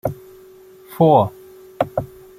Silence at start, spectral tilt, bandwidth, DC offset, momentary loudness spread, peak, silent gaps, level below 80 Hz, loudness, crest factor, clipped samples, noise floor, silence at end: 0.05 s; -8.5 dB/octave; 16 kHz; under 0.1%; 22 LU; -2 dBFS; none; -50 dBFS; -18 LUFS; 18 dB; under 0.1%; -44 dBFS; 0.35 s